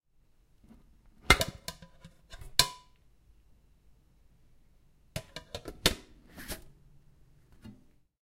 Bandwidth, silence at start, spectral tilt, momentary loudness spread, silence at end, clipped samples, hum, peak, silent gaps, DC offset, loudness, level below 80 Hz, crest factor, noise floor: 16 kHz; 1.3 s; -2 dB/octave; 28 LU; 0.55 s; under 0.1%; none; -2 dBFS; none; under 0.1%; -30 LUFS; -48 dBFS; 36 dB; -65 dBFS